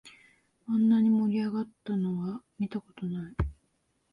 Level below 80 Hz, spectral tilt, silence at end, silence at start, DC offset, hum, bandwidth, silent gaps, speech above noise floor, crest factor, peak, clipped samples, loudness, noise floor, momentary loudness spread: -46 dBFS; -9 dB/octave; 0.6 s; 0.05 s; under 0.1%; none; 5.4 kHz; none; 44 dB; 14 dB; -16 dBFS; under 0.1%; -30 LUFS; -74 dBFS; 13 LU